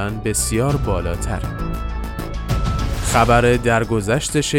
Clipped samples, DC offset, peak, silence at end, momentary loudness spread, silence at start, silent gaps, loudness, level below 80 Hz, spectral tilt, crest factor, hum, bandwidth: under 0.1%; under 0.1%; -2 dBFS; 0 s; 12 LU; 0 s; none; -19 LUFS; -26 dBFS; -5 dB/octave; 16 dB; none; 17 kHz